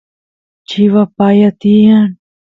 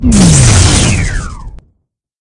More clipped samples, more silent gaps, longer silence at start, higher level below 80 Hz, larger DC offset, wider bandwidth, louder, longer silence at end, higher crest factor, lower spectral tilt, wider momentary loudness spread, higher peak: second, under 0.1% vs 1%; neither; first, 0.7 s vs 0 s; second, -52 dBFS vs -18 dBFS; neither; second, 6 kHz vs 12 kHz; second, -10 LUFS vs -7 LUFS; second, 0.4 s vs 0.65 s; about the same, 10 dB vs 10 dB; first, -8.5 dB/octave vs -4 dB/octave; second, 8 LU vs 16 LU; about the same, 0 dBFS vs 0 dBFS